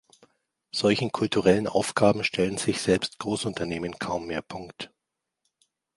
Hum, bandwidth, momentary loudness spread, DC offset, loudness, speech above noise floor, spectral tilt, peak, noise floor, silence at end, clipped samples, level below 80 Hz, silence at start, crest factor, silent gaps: none; 11.5 kHz; 14 LU; under 0.1%; -26 LUFS; 59 dB; -4.5 dB/octave; -6 dBFS; -85 dBFS; 1.1 s; under 0.1%; -56 dBFS; 0.75 s; 22 dB; none